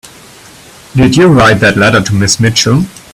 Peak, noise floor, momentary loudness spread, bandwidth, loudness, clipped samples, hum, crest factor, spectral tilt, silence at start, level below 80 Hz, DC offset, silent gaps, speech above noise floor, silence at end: 0 dBFS; -35 dBFS; 5 LU; 15.5 kHz; -8 LUFS; 0.2%; none; 10 dB; -4.5 dB/octave; 0.95 s; -34 dBFS; 0.2%; none; 28 dB; 0.15 s